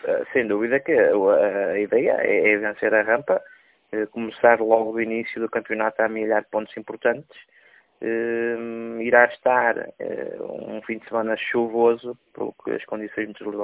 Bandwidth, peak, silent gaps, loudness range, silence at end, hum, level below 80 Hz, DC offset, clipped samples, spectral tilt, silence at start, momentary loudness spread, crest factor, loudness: 4 kHz; 0 dBFS; none; 6 LU; 0 s; none; -66 dBFS; under 0.1%; under 0.1%; -9 dB/octave; 0.05 s; 13 LU; 22 dB; -22 LUFS